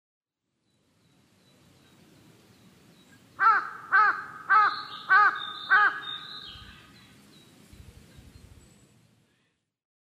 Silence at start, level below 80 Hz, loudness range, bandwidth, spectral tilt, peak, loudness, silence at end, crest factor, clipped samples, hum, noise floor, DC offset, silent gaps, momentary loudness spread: 3.4 s; -64 dBFS; 8 LU; 13.5 kHz; -2.5 dB/octave; -10 dBFS; -23 LUFS; 3.45 s; 20 dB; under 0.1%; none; -78 dBFS; under 0.1%; none; 19 LU